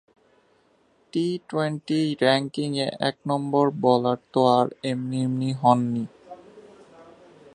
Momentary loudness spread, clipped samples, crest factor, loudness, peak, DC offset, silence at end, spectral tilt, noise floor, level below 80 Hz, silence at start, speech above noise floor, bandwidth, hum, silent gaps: 7 LU; under 0.1%; 22 dB; -24 LUFS; -4 dBFS; under 0.1%; 0.5 s; -6.5 dB/octave; -63 dBFS; -70 dBFS; 1.15 s; 40 dB; 10.5 kHz; none; none